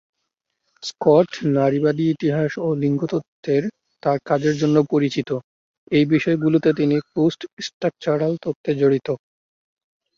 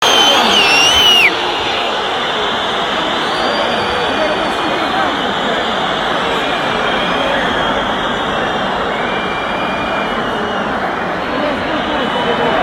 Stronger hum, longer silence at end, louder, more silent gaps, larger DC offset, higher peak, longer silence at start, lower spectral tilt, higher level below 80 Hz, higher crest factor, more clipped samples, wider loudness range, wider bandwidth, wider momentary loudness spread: neither; first, 1 s vs 0 s; second, -20 LUFS vs -13 LUFS; first, 3.28-3.43 s, 5.44-5.87 s, 7.53-7.57 s, 7.74-7.81 s, 8.55-8.64 s vs none; neither; about the same, -2 dBFS vs 0 dBFS; first, 0.8 s vs 0 s; first, -7 dB/octave vs -2.5 dB/octave; second, -62 dBFS vs -40 dBFS; about the same, 18 dB vs 14 dB; neither; second, 2 LU vs 6 LU; second, 7.4 kHz vs 16.5 kHz; about the same, 10 LU vs 9 LU